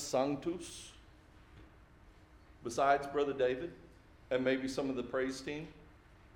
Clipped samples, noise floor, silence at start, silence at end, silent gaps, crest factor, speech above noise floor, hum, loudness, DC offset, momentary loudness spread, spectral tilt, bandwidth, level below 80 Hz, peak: under 0.1%; -60 dBFS; 0 s; 0.4 s; none; 20 dB; 25 dB; none; -36 LUFS; under 0.1%; 17 LU; -4.5 dB/octave; 17 kHz; -62 dBFS; -16 dBFS